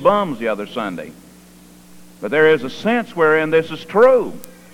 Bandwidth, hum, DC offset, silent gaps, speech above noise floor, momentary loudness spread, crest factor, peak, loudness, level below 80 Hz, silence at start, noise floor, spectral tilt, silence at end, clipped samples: 16 kHz; none; under 0.1%; none; 28 dB; 17 LU; 16 dB; -2 dBFS; -17 LUFS; -56 dBFS; 0 s; -44 dBFS; -6 dB/octave; 0.25 s; under 0.1%